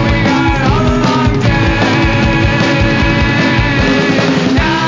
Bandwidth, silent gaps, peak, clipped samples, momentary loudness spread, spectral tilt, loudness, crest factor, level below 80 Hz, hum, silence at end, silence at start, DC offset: 7.6 kHz; none; 0 dBFS; under 0.1%; 1 LU; -6 dB/octave; -11 LUFS; 10 dB; -20 dBFS; none; 0 s; 0 s; under 0.1%